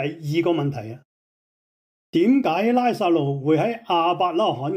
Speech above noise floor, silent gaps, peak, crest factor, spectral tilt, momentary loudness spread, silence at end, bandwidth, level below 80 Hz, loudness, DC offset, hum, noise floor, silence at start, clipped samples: over 69 dB; 1.05-2.13 s; -8 dBFS; 14 dB; -7.5 dB/octave; 7 LU; 0 s; 15.5 kHz; -70 dBFS; -21 LUFS; under 0.1%; none; under -90 dBFS; 0 s; under 0.1%